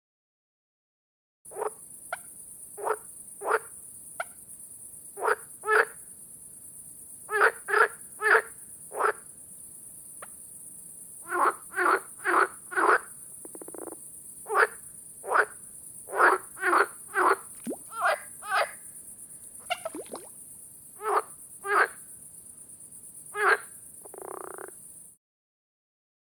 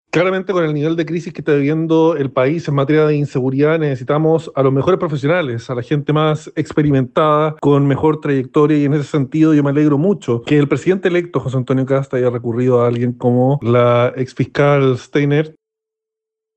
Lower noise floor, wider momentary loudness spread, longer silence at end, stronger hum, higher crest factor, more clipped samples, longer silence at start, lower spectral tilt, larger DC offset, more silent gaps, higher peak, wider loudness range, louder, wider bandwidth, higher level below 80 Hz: second, -48 dBFS vs -83 dBFS; first, 19 LU vs 5 LU; first, 1.25 s vs 1.05 s; neither; first, 26 dB vs 14 dB; neither; first, 1.45 s vs 0.15 s; second, -1.5 dB/octave vs -8 dB/octave; neither; neither; second, -6 dBFS vs -2 dBFS; first, 8 LU vs 2 LU; second, -27 LUFS vs -15 LUFS; first, 19.5 kHz vs 8.4 kHz; second, -74 dBFS vs -52 dBFS